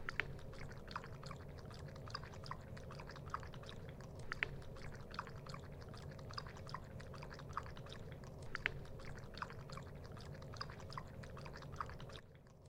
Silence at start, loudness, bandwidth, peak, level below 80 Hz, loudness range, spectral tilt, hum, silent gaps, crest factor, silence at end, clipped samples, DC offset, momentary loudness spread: 0 s; -50 LUFS; 16.5 kHz; -16 dBFS; -58 dBFS; 2 LU; -5 dB/octave; none; none; 32 dB; 0 s; under 0.1%; under 0.1%; 9 LU